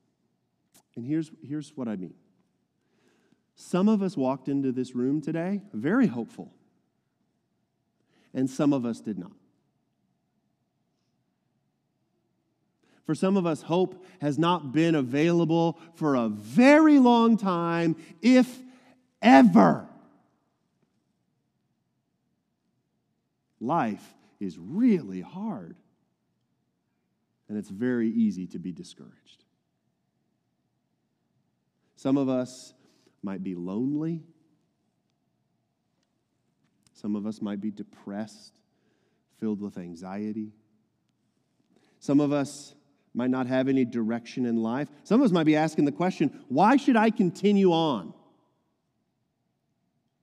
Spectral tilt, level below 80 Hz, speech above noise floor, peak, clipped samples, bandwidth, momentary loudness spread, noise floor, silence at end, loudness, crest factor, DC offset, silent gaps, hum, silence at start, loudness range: -7 dB/octave; -80 dBFS; 52 dB; -4 dBFS; under 0.1%; 11.5 kHz; 17 LU; -77 dBFS; 2.1 s; -25 LUFS; 24 dB; under 0.1%; none; none; 0.95 s; 16 LU